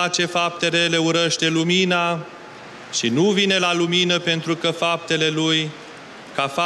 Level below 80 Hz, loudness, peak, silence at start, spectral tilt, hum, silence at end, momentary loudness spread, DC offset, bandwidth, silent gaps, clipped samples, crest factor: -68 dBFS; -19 LUFS; -6 dBFS; 0 s; -3.5 dB/octave; none; 0 s; 18 LU; under 0.1%; 12.5 kHz; none; under 0.1%; 14 dB